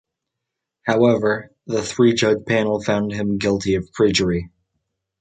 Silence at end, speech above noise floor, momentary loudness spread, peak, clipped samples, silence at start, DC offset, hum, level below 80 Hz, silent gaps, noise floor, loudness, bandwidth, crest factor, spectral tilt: 0.75 s; 63 dB; 9 LU; -4 dBFS; under 0.1%; 0.85 s; under 0.1%; none; -46 dBFS; none; -82 dBFS; -19 LUFS; 9.4 kHz; 16 dB; -5.5 dB/octave